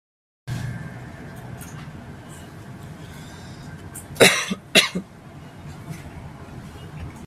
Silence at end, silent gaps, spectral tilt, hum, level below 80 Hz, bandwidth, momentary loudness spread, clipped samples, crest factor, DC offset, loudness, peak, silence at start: 0 s; none; -3 dB/octave; none; -50 dBFS; 15.5 kHz; 23 LU; under 0.1%; 26 dB; under 0.1%; -19 LUFS; 0 dBFS; 0.45 s